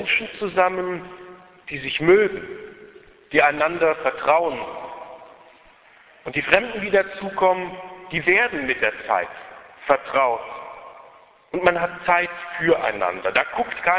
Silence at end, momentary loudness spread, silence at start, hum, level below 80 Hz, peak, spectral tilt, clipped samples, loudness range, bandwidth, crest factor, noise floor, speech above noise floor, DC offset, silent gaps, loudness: 0 s; 20 LU; 0 s; none; -56 dBFS; 0 dBFS; -8 dB/octave; under 0.1%; 3 LU; 4 kHz; 22 dB; -51 dBFS; 30 dB; under 0.1%; none; -21 LUFS